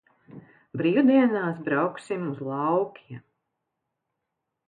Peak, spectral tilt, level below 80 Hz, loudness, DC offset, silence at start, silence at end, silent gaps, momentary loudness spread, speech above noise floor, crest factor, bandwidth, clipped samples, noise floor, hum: -10 dBFS; -8 dB/octave; -76 dBFS; -25 LUFS; under 0.1%; 0.35 s; 1.5 s; none; 21 LU; 58 dB; 18 dB; 9.4 kHz; under 0.1%; -82 dBFS; none